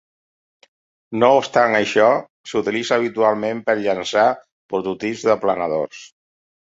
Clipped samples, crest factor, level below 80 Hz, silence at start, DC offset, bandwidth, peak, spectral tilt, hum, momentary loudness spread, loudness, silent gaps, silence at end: under 0.1%; 18 dB; -62 dBFS; 1.1 s; under 0.1%; 7.8 kHz; -2 dBFS; -4.5 dB/octave; none; 10 LU; -19 LUFS; 2.30-2.44 s, 4.52-4.69 s; 0.6 s